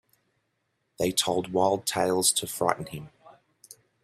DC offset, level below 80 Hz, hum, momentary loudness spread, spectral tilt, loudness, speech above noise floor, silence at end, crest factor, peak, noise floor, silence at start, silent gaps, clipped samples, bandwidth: under 0.1%; -64 dBFS; none; 10 LU; -3 dB/octave; -26 LUFS; 50 dB; 0.3 s; 24 dB; -6 dBFS; -76 dBFS; 1 s; none; under 0.1%; 16 kHz